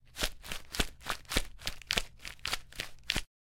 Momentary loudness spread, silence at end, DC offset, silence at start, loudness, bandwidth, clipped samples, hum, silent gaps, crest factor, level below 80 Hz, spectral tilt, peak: 9 LU; 0.25 s; under 0.1%; 0.05 s; -36 LUFS; 17 kHz; under 0.1%; none; none; 32 dB; -44 dBFS; -2 dB/octave; -6 dBFS